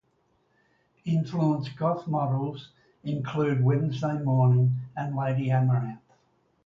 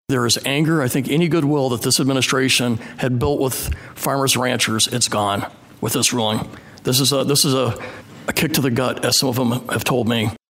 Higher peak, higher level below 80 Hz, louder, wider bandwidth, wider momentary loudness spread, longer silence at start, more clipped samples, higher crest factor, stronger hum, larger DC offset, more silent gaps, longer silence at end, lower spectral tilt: second, -12 dBFS vs -2 dBFS; second, -64 dBFS vs -44 dBFS; second, -27 LUFS vs -18 LUFS; second, 7 kHz vs 16.5 kHz; first, 12 LU vs 9 LU; first, 1.05 s vs 0.1 s; neither; about the same, 14 dB vs 18 dB; neither; neither; neither; first, 0.7 s vs 0.15 s; first, -9.5 dB/octave vs -3.5 dB/octave